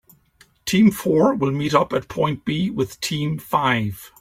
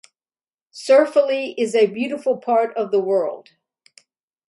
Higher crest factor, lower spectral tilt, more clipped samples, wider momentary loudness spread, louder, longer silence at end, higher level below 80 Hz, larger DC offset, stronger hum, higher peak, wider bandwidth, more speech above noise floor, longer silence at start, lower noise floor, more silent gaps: about the same, 18 dB vs 18 dB; about the same, -5.5 dB/octave vs -4.5 dB/octave; neither; about the same, 8 LU vs 9 LU; about the same, -20 LUFS vs -19 LUFS; second, 0.15 s vs 1.1 s; first, -52 dBFS vs -74 dBFS; neither; neither; about the same, -2 dBFS vs -2 dBFS; first, 16.5 kHz vs 11.5 kHz; second, 36 dB vs over 71 dB; about the same, 0.65 s vs 0.75 s; second, -56 dBFS vs under -90 dBFS; neither